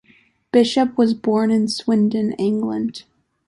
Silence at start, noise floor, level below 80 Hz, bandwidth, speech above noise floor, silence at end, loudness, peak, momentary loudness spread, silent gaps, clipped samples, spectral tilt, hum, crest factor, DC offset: 0.55 s; -56 dBFS; -62 dBFS; 11.5 kHz; 38 dB; 0.45 s; -19 LUFS; -4 dBFS; 7 LU; none; under 0.1%; -6 dB/octave; none; 16 dB; under 0.1%